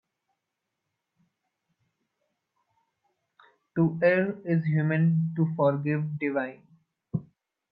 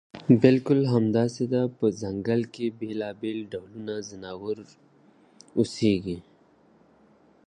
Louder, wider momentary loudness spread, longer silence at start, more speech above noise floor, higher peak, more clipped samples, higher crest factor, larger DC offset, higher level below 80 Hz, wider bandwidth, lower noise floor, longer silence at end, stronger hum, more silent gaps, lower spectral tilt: about the same, -27 LUFS vs -26 LUFS; second, 12 LU vs 16 LU; first, 3.75 s vs 0.15 s; first, 59 dB vs 34 dB; second, -8 dBFS vs -4 dBFS; neither; about the same, 20 dB vs 22 dB; neither; second, -72 dBFS vs -60 dBFS; second, 5 kHz vs 9.6 kHz; first, -84 dBFS vs -59 dBFS; second, 0.5 s vs 1.25 s; neither; neither; first, -11.5 dB/octave vs -7.5 dB/octave